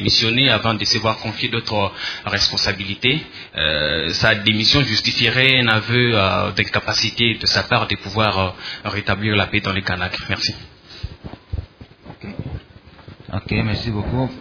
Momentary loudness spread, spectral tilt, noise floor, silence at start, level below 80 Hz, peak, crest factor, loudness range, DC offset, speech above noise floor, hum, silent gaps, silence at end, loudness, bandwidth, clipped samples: 18 LU; -4 dB/octave; -43 dBFS; 0 s; -40 dBFS; 0 dBFS; 20 dB; 12 LU; under 0.1%; 25 dB; none; none; 0 s; -17 LUFS; 5.4 kHz; under 0.1%